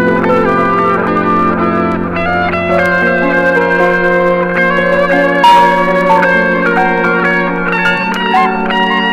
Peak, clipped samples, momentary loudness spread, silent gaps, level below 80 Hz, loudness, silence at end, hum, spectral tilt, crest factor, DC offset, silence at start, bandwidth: 0 dBFS; under 0.1%; 4 LU; none; -38 dBFS; -10 LUFS; 0 s; none; -6.5 dB/octave; 10 dB; under 0.1%; 0 s; 15.5 kHz